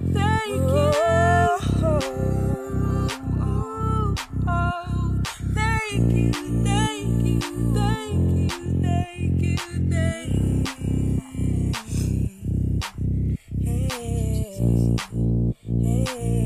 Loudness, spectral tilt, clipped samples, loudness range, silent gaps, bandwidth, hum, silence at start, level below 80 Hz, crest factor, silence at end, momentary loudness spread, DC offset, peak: -23 LUFS; -6.5 dB/octave; under 0.1%; 3 LU; none; 15 kHz; none; 0 s; -30 dBFS; 16 dB; 0 s; 6 LU; under 0.1%; -6 dBFS